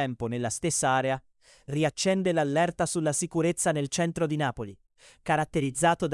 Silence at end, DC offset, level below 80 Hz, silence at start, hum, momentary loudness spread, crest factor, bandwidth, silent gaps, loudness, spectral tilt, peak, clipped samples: 0 s; under 0.1%; -58 dBFS; 0 s; none; 6 LU; 18 dB; 12 kHz; none; -27 LUFS; -4.5 dB/octave; -10 dBFS; under 0.1%